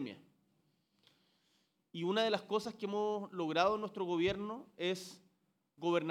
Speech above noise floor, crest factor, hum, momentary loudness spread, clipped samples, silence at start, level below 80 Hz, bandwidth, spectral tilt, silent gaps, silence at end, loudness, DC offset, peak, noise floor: 43 dB; 22 dB; none; 12 LU; under 0.1%; 0 s; -72 dBFS; 14.5 kHz; -5 dB/octave; none; 0 s; -37 LUFS; under 0.1%; -16 dBFS; -79 dBFS